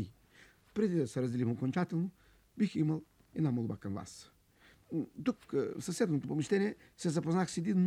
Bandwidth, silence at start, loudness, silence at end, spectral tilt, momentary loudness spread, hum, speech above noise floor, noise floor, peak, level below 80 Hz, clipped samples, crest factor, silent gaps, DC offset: 13.5 kHz; 0 s; -35 LUFS; 0 s; -7 dB/octave; 9 LU; none; 31 dB; -65 dBFS; -18 dBFS; -70 dBFS; under 0.1%; 16 dB; none; under 0.1%